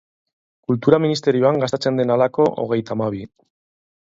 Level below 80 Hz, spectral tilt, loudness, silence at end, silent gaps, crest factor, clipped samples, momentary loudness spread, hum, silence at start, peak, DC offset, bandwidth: -60 dBFS; -7 dB/octave; -19 LUFS; 0.9 s; none; 20 dB; under 0.1%; 8 LU; none; 0.7 s; 0 dBFS; under 0.1%; 7.8 kHz